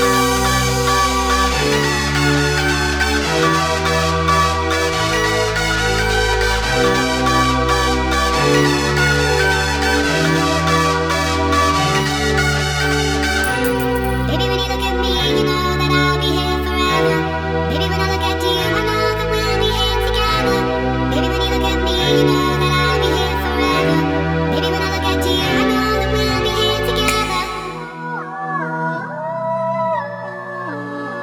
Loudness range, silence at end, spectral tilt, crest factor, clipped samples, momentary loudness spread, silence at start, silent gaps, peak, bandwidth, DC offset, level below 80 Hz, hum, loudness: 3 LU; 0 s; -4 dB/octave; 14 dB; under 0.1%; 6 LU; 0 s; none; -2 dBFS; over 20 kHz; under 0.1%; -26 dBFS; none; -16 LUFS